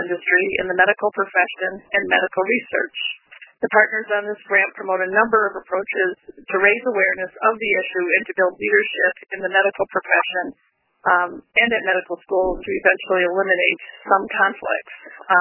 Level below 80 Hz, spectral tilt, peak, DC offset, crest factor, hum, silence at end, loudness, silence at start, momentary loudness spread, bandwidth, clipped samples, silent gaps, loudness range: -52 dBFS; -7 dB/octave; 0 dBFS; under 0.1%; 20 dB; none; 0 s; -19 LUFS; 0 s; 9 LU; 3.2 kHz; under 0.1%; none; 1 LU